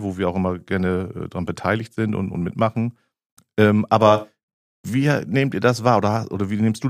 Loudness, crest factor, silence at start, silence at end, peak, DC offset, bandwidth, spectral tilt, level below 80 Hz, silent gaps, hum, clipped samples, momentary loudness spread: -21 LUFS; 18 dB; 0 s; 0 s; -2 dBFS; under 0.1%; 15 kHz; -7 dB/octave; -54 dBFS; 3.26-3.37 s, 4.43-4.84 s; none; under 0.1%; 11 LU